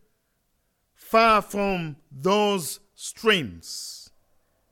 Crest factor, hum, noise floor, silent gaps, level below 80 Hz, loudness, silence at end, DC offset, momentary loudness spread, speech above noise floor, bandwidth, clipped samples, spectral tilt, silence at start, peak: 20 dB; none; -72 dBFS; none; -54 dBFS; -23 LUFS; 0.7 s; under 0.1%; 18 LU; 48 dB; 17.5 kHz; under 0.1%; -4 dB/octave; 1.05 s; -6 dBFS